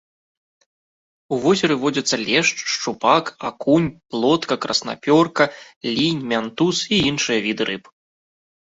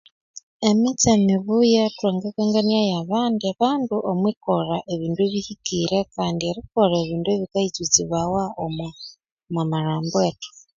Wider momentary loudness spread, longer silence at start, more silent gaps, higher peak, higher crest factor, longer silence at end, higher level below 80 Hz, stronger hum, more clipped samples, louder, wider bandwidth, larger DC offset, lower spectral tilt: about the same, 8 LU vs 9 LU; first, 1.3 s vs 0.35 s; second, 5.76-5.81 s vs 0.43-0.60 s, 4.37-4.41 s, 9.32-9.37 s; about the same, -2 dBFS vs 0 dBFS; about the same, 20 dB vs 20 dB; first, 0.85 s vs 0.3 s; about the same, -56 dBFS vs -54 dBFS; neither; neither; first, -19 LUFS vs -22 LUFS; about the same, 8 kHz vs 7.6 kHz; neither; about the same, -4 dB/octave vs -5 dB/octave